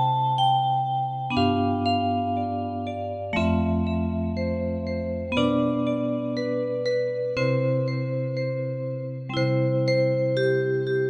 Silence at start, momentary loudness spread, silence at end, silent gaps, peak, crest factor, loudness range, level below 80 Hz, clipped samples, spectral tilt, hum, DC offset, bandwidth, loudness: 0 s; 7 LU; 0 s; none; -10 dBFS; 14 dB; 2 LU; -48 dBFS; under 0.1%; -8 dB/octave; none; under 0.1%; 9.2 kHz; -25 LUFS